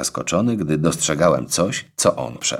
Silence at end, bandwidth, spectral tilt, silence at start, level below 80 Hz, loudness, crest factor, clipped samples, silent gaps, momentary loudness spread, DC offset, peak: 0 s; 16.5 kHz; -4 dB/octave; 0 s; -48 dBFS; -19 LUFS; 16 dB; under 0.1%; none; 4 LU; under 0.1%; -4 dBFS